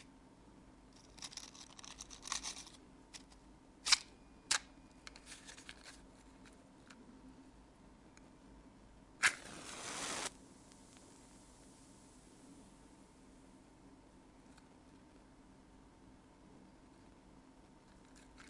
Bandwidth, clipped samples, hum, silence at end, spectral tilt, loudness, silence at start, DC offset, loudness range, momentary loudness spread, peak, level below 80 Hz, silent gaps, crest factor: 11.5 kHz; under 0.1%; none; 0 s; 0 dB/octave; -40 LUFS; 0 s; under 0.1%; 23 LU; 25 LU; -12 dBFS; -68 dBFS; none; 36 dB